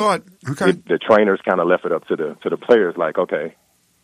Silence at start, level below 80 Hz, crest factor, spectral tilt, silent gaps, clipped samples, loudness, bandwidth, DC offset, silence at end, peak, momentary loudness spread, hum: 0 s; -66 dBFS; 18 dB; -6 dB/octave; none; under 0.1%; -18 LUFS; 13 kHz; under 0.1%; 0.55 s; -2 dBFS; 10 LU; none